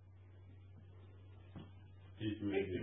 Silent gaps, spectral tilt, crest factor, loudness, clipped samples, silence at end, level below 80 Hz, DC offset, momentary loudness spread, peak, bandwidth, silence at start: none; -6 dB/octave; 20 dB; -44 LUFS; under 0.1%; 0 s; -64 dBFS; under 0.1%; 20 LU; -26 dBFS; 3.8 kHz; 0 s